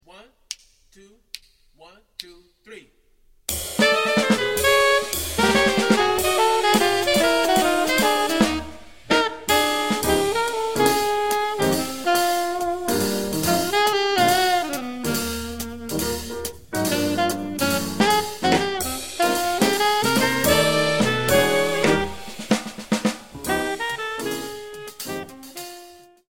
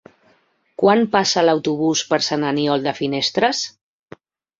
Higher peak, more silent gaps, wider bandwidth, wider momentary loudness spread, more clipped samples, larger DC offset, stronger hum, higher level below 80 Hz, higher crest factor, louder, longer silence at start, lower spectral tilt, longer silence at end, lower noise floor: about the same, -2 dBFS vs -2 dBFS; neither; first, 17 kHz vs 7.8 kHz; first, 15 LU vs 6 LU; neither; first, 0.6% vs under 0.1%; neither; first, -46 dBFS vs -62 dBFS; about the same, 20 dB vs 18 dB; second, -21 LUFS vs -18 LUFS; second, 0 s vs 0.8 s; about the same, -3 dB/octave vs -4 dB/octave; second, 0 s vs 0.9 s; about the same, -57 dBFS vs -60 dBFS